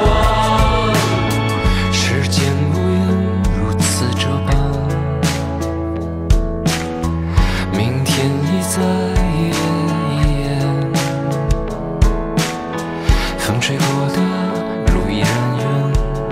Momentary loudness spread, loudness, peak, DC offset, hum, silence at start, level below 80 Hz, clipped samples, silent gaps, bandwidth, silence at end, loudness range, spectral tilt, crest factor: 5 LU; -17 LUFS; 0 dBFS; under 0.1%; none; 0 s; -22 dBFS; under 0.1%; none; 16 kHz; 0 s; 3 LU; -5.5 dB/octave; 16 dB